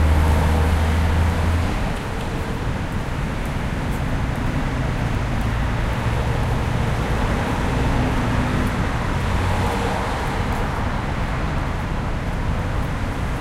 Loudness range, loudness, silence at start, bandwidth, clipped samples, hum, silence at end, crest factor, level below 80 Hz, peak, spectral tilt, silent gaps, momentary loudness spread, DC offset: 3 LU; -22 LUFS; 0 s; 15 kHz; under 0.1%; none; 0 s; 14 dB; -24 dBFS; -6 dBFS; -6.5 dB/octave; none; 6 LU; under 0.1%